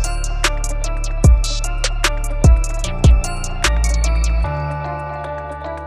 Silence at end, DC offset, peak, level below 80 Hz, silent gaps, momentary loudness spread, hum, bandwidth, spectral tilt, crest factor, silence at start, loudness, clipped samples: 0 s; under 0.1%; 0 dBFS; -18 dBFS; none; 11 LU; none; 13.5 kHz; -4.5 dB/octave; 16 dB; 0 s; -19 LUFS; under 0.1%